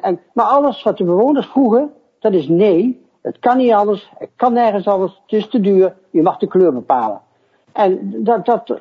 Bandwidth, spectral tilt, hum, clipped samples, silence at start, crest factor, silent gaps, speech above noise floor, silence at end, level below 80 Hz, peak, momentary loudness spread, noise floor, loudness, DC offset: 6 kHz; -9 dB/octave; none; under 0.1%; 0 s; 14 dB; none; 42 dB; 0 s; -64 dBFS; 0 dBFS; 8 LU; -57 dBFS; -15 LUFS; under 0.1%